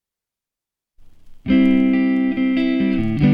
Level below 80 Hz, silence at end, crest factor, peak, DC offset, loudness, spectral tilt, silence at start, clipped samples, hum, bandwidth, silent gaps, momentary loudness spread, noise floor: -40 dBFS; 0 s; 14 dB; -4 dBFS; under 0.1%; -17 LUFS; -9 dB/octave; 1 s; under 0.1%; none; 5.2 kHz; none; 4 LU; -87 dBFS